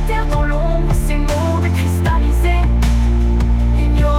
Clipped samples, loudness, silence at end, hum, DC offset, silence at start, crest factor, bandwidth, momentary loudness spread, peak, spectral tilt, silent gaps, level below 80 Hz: under 0.1%; -16 LUFS; 0 s; none; under 0.1%; 0 s; 8 dB; 14 kHz; 3 LU; -6 dBFS; -7 dB/octave; none; -16 dBFS